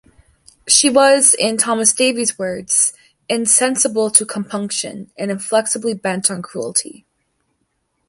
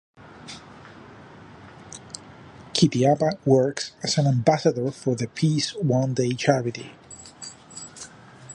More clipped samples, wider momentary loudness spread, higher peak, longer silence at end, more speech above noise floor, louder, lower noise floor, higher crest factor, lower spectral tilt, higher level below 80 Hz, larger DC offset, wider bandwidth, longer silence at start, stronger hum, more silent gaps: neither; second, 13 LU vs 22 LU; first, 0 dBFS vs -4 dBFS; first, 1.2 s vs 0 s; first, 52 dB vs 23 dB; first, -15 LUFS vs -23 LUFS; first, -68 dBFS vs -45 dBFS; about the same, 18 dB vs 20 dB; second, -1.5 dB/octave vs -5.5 dB/octave; about the same, -60 dBFS vs -60 dBFS; neither; first, 16 kHz vs 11 kHz; first, 0.65 s vs 0.25 s; neither; neither